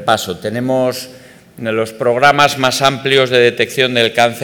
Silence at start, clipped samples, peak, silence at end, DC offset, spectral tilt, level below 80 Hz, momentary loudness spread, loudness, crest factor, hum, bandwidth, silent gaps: 0 s; under 0.1%; 0 dBFS; 0 s; under 0.1%; -4 dB/octave; -54 dBFS; 10 LU; -13 LUFS; 14 dB; none; 19 kHz; none